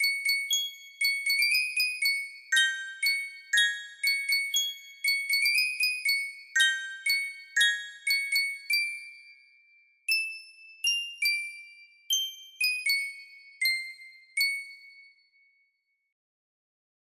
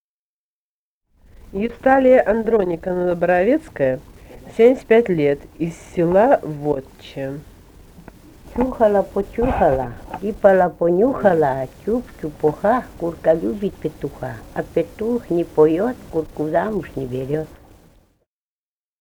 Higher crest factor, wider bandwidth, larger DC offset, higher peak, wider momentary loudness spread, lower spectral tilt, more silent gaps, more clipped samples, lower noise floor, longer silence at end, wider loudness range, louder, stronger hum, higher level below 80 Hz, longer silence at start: about the same, 22 dB vs 20 dB; second, 16 kHz vs 20 kHz; neither; second, -10 dBFS vs 0 dBFS; second, 11 LU vs 14 LU; second, 6 dB/octave vs -8 dB/octave; neither; neither; second, -75 dBFS vs under -90 dBFS; first, 2.1 s vs 1.45 s; about the same, 6 LU vs 4 LU; second, -26 LUFS vs -19 LUFS; neither; second, -84 dBFS vs -42 dBFS; second, 0 s vs 1.5 s